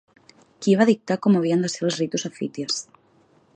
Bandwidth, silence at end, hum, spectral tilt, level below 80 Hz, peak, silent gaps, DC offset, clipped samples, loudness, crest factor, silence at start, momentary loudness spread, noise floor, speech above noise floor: 9.2 kHz; 0.75 s; none; -5 dB/octave; -72 dBFS; -4 dBFS; none; under 0.1%; under 0.1%; -22 LUFS; 20 dB; 0.6 s; 10 LU; -59 dBFS; 38 dB